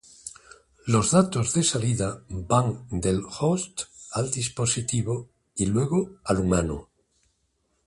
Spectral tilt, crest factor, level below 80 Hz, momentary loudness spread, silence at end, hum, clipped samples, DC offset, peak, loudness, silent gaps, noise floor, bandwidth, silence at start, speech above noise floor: -5 dB/octave; 20 dB; -46 dBFS; 14 LU; 1.05 s; none; under 0.1%; under 0.1%; -6 dBFS; -25 LUFS; none; -72 dBFS; 11.5 kHz; 0.25 s; 47 dB